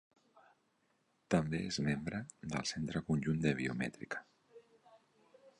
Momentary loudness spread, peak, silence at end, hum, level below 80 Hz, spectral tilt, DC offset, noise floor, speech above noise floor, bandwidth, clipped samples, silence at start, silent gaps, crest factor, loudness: 10 LU; -18 dBFS; 0.1 s; none; -62 dBFS; -5.5 dB/octave; under 0.1%; -77 dBFS; 40 dB; 11.5 kHz; under 0.1%; 0.35 s; none; 22 dB; -38 LUFS